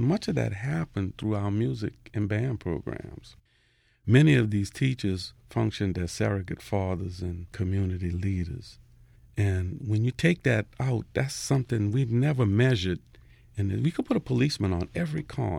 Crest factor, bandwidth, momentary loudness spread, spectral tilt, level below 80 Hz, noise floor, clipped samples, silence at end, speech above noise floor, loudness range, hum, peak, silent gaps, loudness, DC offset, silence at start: 20 dB; 13.5 kHz; 11 LU; -6.5 dB/octave; -50 dBFS; -66 dBFS; under 0.1%; 0 s; 39 dB; 5 LU; none; -8 dBFS; none; -28 LUFS; under 0.1%; 0 s